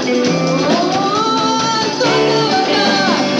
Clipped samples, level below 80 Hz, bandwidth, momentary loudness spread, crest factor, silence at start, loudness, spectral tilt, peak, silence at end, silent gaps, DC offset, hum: under 0.1%; -54 dBFS; 10.5 kHz; 2 LU; 12 dB; 0 s; -14 LUFS; -4 dB/octave; -2 dBFS; 0 s; none; under 0.1%; none